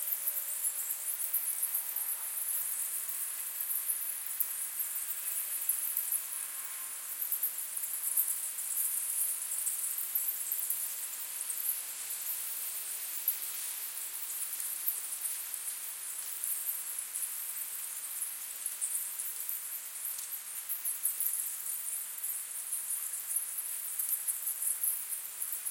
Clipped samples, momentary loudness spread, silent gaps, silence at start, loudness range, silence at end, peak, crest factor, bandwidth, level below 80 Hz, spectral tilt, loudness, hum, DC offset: under 0.1%; 6 LU; none; 0 s; 4 LU; 0 s; -12 dBFS; 26 dB; 17 kHz; under -90 dBFS; 4 dB/octave; -33 LUFS; none; under 0.1%